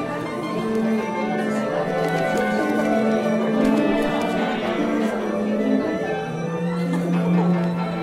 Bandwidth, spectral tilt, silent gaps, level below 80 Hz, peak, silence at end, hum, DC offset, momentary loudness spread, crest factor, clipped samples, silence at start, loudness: 14 kHz; -7 dB/octave; none; -52 dBFS; -6 dBFS; 0 s; none; under 0.1%; 6 LU; 14 dB; under 0.1%; 0 s; -22 LUFS